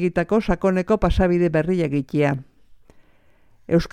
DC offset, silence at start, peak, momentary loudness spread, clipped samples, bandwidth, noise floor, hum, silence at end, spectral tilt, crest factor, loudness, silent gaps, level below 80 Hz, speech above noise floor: under 0.1%; 0 s; -4 dBFS; 4 LU; under 0.1%; 10.5 kHz; -54 dBFS; none; 0.05 s; -8 dB/octave; 18 dB; -21 LUFS; none; -34 dBFS; 34 dB